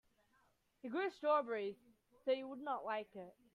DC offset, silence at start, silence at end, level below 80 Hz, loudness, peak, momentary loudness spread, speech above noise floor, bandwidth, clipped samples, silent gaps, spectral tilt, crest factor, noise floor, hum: under 0.1%; 0.85 s; 0.25 s; -86 dBFS; -41 LUFS; -24 dBFS; 17 LU; 36 dB; 10 kHz; under 0.1%; none; -5.5 dB/octave; 18 dB; -77 dBFS; none